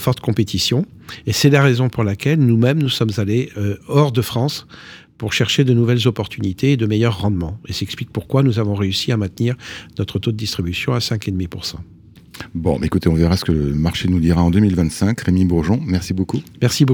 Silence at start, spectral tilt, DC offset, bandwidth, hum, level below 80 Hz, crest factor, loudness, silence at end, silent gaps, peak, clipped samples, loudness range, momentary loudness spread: 0 s; -6 dB/octave; under 0.1%; 19.5 kHz; none; -38 dBFS; 16 dB; -18 LUFS; 0 s; none; -2 dBFS; under 0.1%; 5 LU; 11 LU